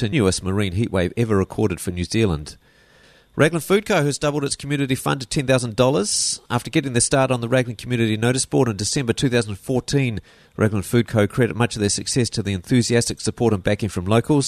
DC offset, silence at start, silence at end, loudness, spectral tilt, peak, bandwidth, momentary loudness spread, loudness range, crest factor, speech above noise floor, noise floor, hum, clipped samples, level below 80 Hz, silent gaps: under 0.1%; 0 s; 0 s; -20 LUFS; -5 dB/octave; -2 dBFS; 13.5 kHz; 6 LU; 2 LU; 18 dB; 32 dB; -52 dBFS; none; under 0.1%; -44 dBFS; none